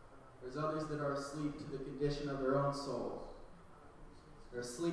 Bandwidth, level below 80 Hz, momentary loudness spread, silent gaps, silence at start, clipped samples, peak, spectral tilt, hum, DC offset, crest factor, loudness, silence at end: 11 kHz; -58 dBFS; 24 LU; none; 0 s; under 0.1%; -24 dBFS; -6 dB/octave; none; under 0.1%; 16 dB; -40 LUFS; 0 s